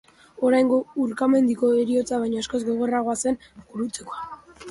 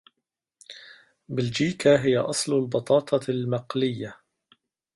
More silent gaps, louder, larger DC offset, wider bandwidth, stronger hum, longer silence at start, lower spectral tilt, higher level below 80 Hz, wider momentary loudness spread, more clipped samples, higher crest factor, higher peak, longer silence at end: neither; about the same, -23 LUFS vs -24 LUFS; neither; about the same, 11.5 kHz vs 11.5 kHz; neither; second, 0.4 s vs 0.7 s; about the same, -4.5 dB/octave vs -5 dB/octave; about the same, -60 dBFS vs -64 dBFS; second, 15 LU vs 21 LU; neither; second, 14 dB vs 20 dB; about the same, -8 dBFS vs -6 dBFS; second, 0 s vs 0.8 s